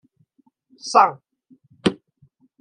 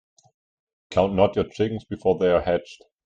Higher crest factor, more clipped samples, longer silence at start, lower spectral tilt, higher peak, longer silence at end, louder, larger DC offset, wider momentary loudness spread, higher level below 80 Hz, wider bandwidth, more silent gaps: about the same, 24 dB vs 20 dB; neither; about the same, 0.85 s vs 0.9 s; second, -4.5 dB/octave vs -7 dB/octave; first, 0 dBFS vs -4 dBFS; first, 0.65 s vs 0.3 s; first, -20 LUFS vs -23 LUFS; neither; first, 20 LU vs 7 LU; second, -62 dBFS vs -50 dBFS; first, 10.5 kHz vs 8.8 kHz; neither